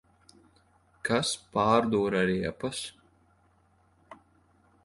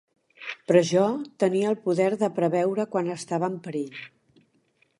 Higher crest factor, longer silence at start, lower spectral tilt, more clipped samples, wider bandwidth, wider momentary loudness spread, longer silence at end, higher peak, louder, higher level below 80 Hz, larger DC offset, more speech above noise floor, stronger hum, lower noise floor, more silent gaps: about the same, 22 dB vs 20 dB; first, 1.05 s vs 0.4 s; second, -4.5 dB/octave vs -6 dB/octave; neither; about the same, 11.5 kHz vs 11.5 kHz; second, 12 LU vs 15 LU; second, 0.7 s vs 0.95 s; second, -8 dBFS vs -4 dBFS; second, -28 LUFS vs -25 LUFS; first, -60 dBFS vs -74 dBFS; neither; second, 38 dB vs 43 dB; neither; about the same, -66 dBFS vs -67 dBFS; neither